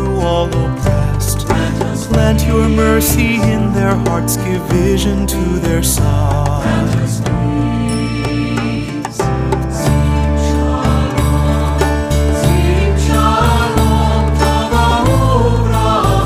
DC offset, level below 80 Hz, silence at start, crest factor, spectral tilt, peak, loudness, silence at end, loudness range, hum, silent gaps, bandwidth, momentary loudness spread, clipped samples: under 0.1%; -18 dBFS; 0 s; 12 dB; -6 dB/octave; 0 dBFS; -14 LUFS; 0 s; 3 LU; none; none; 15.5 kHz; 5 LU; under 0.1%